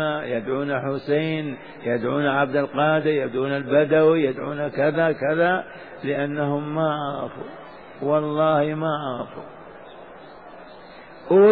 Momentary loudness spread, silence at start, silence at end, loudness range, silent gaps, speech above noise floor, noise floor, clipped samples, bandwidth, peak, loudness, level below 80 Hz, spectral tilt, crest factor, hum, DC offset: 23 LU; 0 s; 0 s; 5 LU; none; 21 dB; -43 dBFS; under 0.1%; 4.9 kHz; -6 dBFS; -22 LUFS; -64 dBFS; -10.5 dB/octave; 16 dB; none; 0.2%